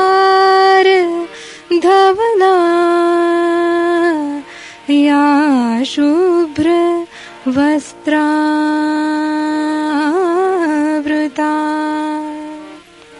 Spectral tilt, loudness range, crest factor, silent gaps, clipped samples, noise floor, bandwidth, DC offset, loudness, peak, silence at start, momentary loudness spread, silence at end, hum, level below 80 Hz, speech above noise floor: -4 dB/octave; 4 LU; 12 dB; none; under 0.1%; -37 dBFS; 11.5 kHz; under 0.1%; -13 LUFS; -2 dBFS; 0 s; 13 LU; 0 s; none; -58 dBFS; 24 dB